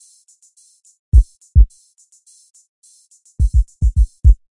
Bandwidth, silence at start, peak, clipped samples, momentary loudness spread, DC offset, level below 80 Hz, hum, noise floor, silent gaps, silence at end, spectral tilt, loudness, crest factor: 10.5 kHz; 1.15 s; 0 dBFS; under 0.1%; 4 LU; under 0.1%; -16 dBFS; none; -53 dBFS; 2.50-2.54 s, 2.68-2.82 s; 0.15 s; -8.5 dB/octave; -17 LUFS; 16 dB